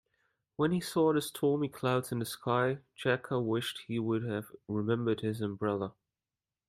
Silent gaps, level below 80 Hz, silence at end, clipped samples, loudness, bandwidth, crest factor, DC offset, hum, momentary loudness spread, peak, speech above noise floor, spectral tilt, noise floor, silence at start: none; -70 dBFS; 0.8 s; under 0.1%; -33 LUFS; 16 kHz; 18 dB; under 0.1%; none; 8 LU; -14 dBFS; over 58 dB; -6 dB/octave; under -90 dBFS; 0.6 s